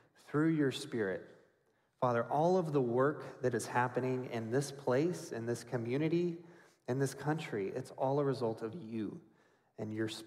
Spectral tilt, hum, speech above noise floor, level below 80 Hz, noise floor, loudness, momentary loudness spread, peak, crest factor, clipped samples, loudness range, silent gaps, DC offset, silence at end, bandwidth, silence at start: -6.5 dB/octave; none; 40 dB; -78 dBFS; -75 dBFS; -36 LUFS; 10 LU; -18 dBFS; 16 dB; under 0.1%; 4 LU; none; under 0.1%; 0 s; 15.5 kHz; 0.3 s